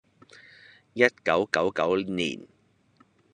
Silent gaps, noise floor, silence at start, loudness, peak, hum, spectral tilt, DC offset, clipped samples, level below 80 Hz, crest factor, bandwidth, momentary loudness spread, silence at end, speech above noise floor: none; -63 dBFS; 0.95 s; -25 LUFS; -4 dBFS; none; -4.5 dB/octave; under 0.1%; under 0.1%; -68 dBFS; 24 dB; 10.5 kHz; 11 LU; 0.9 s; 37 dB